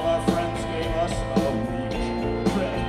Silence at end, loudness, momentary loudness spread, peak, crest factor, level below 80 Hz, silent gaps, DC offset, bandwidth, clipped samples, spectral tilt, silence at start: 0 s; -25 LUFS; 4 LU; -6 dBFS; 20 dB; -36 dBFS; none; under 0.1%; 14 kHz; under 0.1%; -6 dB/octave; 0 s